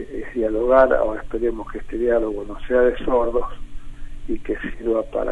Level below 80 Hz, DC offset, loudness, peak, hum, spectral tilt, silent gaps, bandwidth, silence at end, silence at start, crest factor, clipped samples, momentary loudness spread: -32 dBFS; under 0.1%; -21 LUFS; -2 dBFS; none; -7.5 dB/octave; none; 7.6 kHz; 0 s; 0 s; 18 dB; under 0.1%; 15 LU